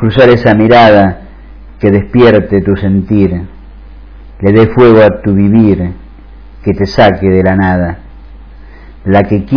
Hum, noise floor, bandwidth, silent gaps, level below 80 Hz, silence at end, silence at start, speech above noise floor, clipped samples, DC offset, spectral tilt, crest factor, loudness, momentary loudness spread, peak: none; -31 dBFS; 5.4 kHz; none; -30 dBFS; 0 s; 0 s; 25 dB; 3%; 0.8%; -9 dB/octave; 8 dB; -8 LUFS; 14 LU; 0 dBFS